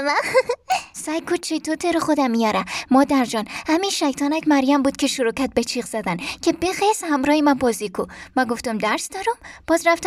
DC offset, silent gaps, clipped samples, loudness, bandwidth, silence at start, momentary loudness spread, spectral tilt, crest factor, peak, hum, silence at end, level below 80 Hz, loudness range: under 0.1%; none; under 0.1%; -21 LUFS; 15.5 kHz; 0 s; 8 LU; -3.5 dB/octave; 18 dB; -4 dBFS; none; 0 s; -52 dBFS; 2 LU